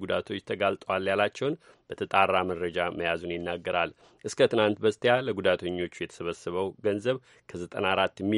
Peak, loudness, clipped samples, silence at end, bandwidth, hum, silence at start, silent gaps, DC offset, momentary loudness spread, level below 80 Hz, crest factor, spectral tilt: -6 dBFS; -28 LUFS; under 0.1%; 0 s; 11.5 kHz; none; 0 s; none; under 0.1%; 11 LU; -64 dBFS; 22 dB; -5 dB/octave